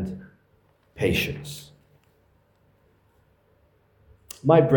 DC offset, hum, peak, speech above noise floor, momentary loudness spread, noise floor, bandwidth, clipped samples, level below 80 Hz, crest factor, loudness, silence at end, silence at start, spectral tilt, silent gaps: under 0.1%; none; -4 dBFS; 42 dB; 27 LU; -63 dBFS; 18 kHz; under 0.1%; -54 dBFS; 22 dB; -25 LUFS; 0 s; 0 s; -6.5 dB/octave; none